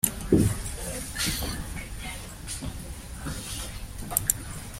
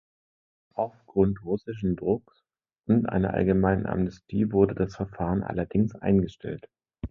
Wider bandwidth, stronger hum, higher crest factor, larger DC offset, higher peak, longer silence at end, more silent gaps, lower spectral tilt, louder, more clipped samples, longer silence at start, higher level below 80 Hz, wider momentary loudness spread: first, 16.5 kHz vs 6.8 kHz; neither; first, 28 dB vs 20 dB; neither; first, -2 dBFS vs -8 dBFS; about the same, 0 s vs 0.05 s; neither; second, -4 dB/octave vs -10 dB/octave; second, -30 LUFS vs -27 LUFS; neither; second, 0.05 s vs 0.75 s; first, -40 dBFS vs -46 dBFS; first, 14 LU vs 10 LU